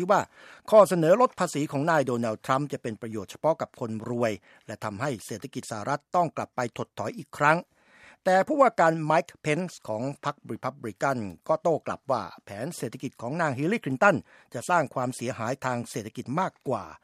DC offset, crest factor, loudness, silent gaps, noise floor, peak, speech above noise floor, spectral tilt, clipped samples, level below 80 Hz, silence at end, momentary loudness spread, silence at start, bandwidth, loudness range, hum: under 0.1%; 22 dB; -27 LUFS; none; -56 dBFS; -6 dBFS; 29 dB; -5.5 dB/octave; under 0.1%; -70 dBFS; 0.05 s; 15 LU; 0 s; 14.5 kHz; 7 LU; none